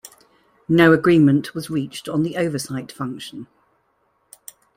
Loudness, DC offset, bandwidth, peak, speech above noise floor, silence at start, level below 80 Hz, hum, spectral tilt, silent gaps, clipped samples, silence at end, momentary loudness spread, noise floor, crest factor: -19 LUFS; under 0.1%; 16 kHz; -2 dBFS; 47 dB; 0.7 s; -56 dBFS; none; -6.5 dB/octave; none; under 0.1%; 1.35 s; 17 LU; -66 dBFS; 18 dB